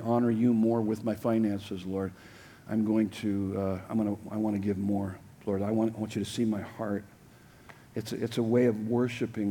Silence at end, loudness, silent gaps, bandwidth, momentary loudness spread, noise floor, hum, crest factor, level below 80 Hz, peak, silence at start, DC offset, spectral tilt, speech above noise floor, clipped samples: 0 s; -30 LUFS; none; 18 kHz; 12 LU; -55 dBFS; none; 16 dB; -66 dBFS; -14 dBFS; 0 s; under 0.1%; -7.5 dB/octave; 26 dB; under 0.1%